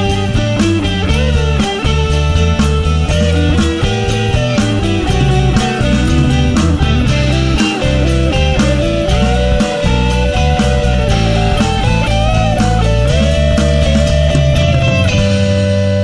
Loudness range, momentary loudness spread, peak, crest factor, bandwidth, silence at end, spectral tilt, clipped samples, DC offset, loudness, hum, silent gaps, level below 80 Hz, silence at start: 1 LU; 2 LU; 0 dBFS; 10 dB; 11 kHz; 0 s; -6 dB/octave; under 0.1%; under 0.1%; -13 LUFS; none; none; -16 dBFS; 0 s